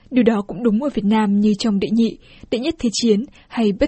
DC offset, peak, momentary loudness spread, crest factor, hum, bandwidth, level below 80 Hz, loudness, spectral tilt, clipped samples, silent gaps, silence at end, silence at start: under 0.1%; -2 dBFS; 6 LU; 16 dB; none; 8.6 kHz; -44 dBFS; -19 LUFS; -6 dB/octave; under 0.1%; none; 0 s; 0.1 s